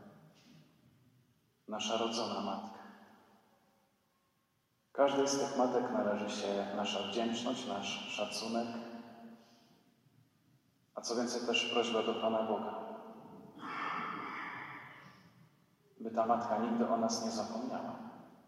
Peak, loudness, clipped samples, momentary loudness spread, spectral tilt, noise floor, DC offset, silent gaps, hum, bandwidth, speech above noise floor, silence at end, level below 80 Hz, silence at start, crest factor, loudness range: -16 dBFS; -36 LUFS; under 0.1%; 17 LU; -3.5 dB/octave; -77 dBFS; under 0.1%; none; none; 15 kHz; 42 dB; 0.15 s; -86 dBFS; 0 s; 22 dB; 8 LU